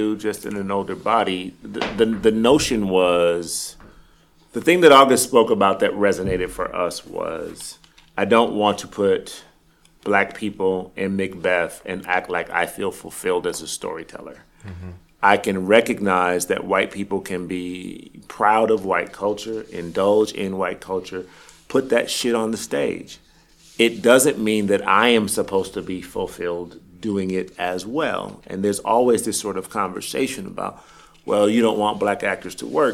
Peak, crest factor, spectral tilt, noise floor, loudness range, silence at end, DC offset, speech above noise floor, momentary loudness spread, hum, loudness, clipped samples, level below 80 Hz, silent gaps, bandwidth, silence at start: 0 dBFS; 20 dB; -4 dB/octave; -56 dBFS; 7 LU; 0 s; under 0.1%; 35 dB; 16 LU; none; -20 LUFS; under 0.1%; -52 dBFS; none; 16 kHz; 0 s